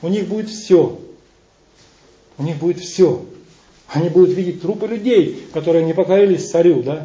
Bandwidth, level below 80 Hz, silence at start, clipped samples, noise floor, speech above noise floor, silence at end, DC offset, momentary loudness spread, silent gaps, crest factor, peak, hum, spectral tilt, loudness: 7.8 kHz; -58 dBFS; 0 s; under 0.1%; -53 dBFS; 38 dB; 0 s; under 0.1%; 11 LU; none; 16 dB; -2 dBFS; none; -7 dB/octave; -16 LUFS